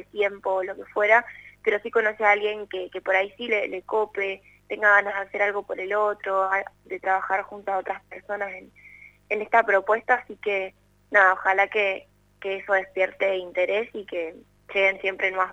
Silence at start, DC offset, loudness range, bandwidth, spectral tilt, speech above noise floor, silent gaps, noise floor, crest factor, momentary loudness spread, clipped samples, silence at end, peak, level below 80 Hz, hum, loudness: 0.15 s; under 0.1%; 4 LU; 7.8 kHz; -4 dB/octave; 25 dB; none; -50 dBFS; 22 dB; 13 LU; under 0.1%; 0 s; -4 dBFS; -66 dBFS; 50 Hz at -60 dBFS; -24 LUFS